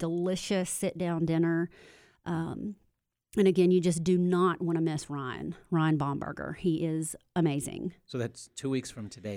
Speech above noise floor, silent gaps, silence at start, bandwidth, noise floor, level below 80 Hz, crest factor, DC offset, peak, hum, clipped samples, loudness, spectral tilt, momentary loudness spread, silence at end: 45 dB; none; 0 s; 16 kHz; -74 dBFS; -62 dBFS; 18 dB; under 0.1%; -12 dBFS; none; under 0.1%; -30 LUFS; -6 dB/octave; 13 LU; 0 s